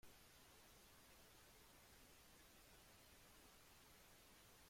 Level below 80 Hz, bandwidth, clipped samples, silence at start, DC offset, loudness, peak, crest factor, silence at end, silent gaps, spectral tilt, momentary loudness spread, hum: -78 dBFS; 16.5 kHz; under 0.1%; 0 s; under 0.1%; -67 LUFS; -52 dBFS; 16 dB; 0 s; none; -2.5 dB/octave; 0 LU; none